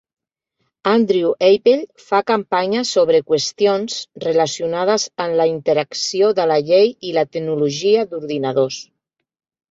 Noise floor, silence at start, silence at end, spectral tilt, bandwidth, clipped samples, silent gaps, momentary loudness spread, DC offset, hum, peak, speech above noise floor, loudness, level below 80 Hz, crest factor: -72 dBFS; 0.85 s; 0.9 s; -4 dB/octave; 8 kHz; under 0.1%; none; 7 LU; under 0.1%; none; -2 dBFS; 55 dB; -17 LUFS; -64 dBFS; 16 dB